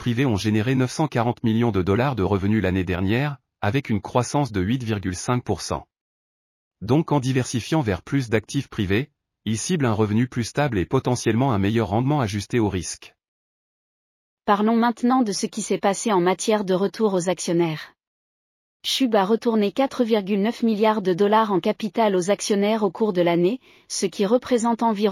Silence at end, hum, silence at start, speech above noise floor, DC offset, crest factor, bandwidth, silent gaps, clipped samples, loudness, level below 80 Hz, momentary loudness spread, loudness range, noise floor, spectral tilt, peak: 0 s; none; 0 s; over 69 dB; under 0.1%; 16 dB; 15 kHz; 6.01-6.71 s, 13.28-14.37 s, 18.07-18.80 s; under 0.1%; -22 LUFS; -52 dBFS; 6 LU; 4 LU; under -90 dBFS; -5.5 dB/octave; -6 dBFS